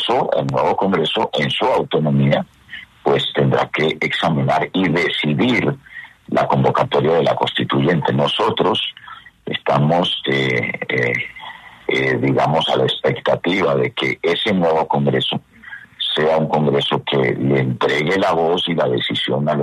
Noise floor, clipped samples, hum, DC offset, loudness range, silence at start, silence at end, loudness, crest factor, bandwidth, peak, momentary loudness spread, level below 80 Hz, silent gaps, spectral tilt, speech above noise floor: -38 dBFS; under 0.1%; none; under 0.1%; 1 LU; 0 s; 0 s; -17 LUFS; 14 dB; 11.5 kHz; -4 dBFS; 8 LU; -52 dBFS; none; -6.5 dB/octave; 21 dB